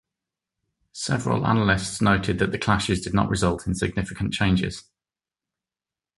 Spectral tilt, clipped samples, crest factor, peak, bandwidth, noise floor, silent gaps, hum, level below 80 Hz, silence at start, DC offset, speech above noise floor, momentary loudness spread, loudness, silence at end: -5.5 dB/octave; under 0.1%; 22 dB; -4 dBFS; 11.5 kHz; under -90 dBFS; none; none; -42 dBFS; 0.95 s; under 0.1%; over 67 dB; 7 LU; -23 LUFS; 1.35 s